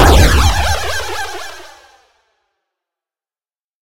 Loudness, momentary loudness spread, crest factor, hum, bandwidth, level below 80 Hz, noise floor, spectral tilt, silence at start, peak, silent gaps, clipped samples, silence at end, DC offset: -14 LUFS; 20 LU; 16 dB; none; 16.5 kHz; -20 dBFS; under -90 dBFS; -4 dB/octave; 0 s; 0 dBFS; 3.64-3.68 s; 0.2%; 0 s; under 0.1%